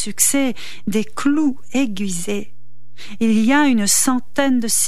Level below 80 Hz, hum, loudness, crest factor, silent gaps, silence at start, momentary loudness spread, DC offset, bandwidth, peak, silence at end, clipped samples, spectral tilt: -56 dBFS; none; -18 LUFS; 16 dB; none; 0 s; 10 LU; 7%; 15 kHz; -2 dBFS; 0 s; under 0.1%; -3 dB/octave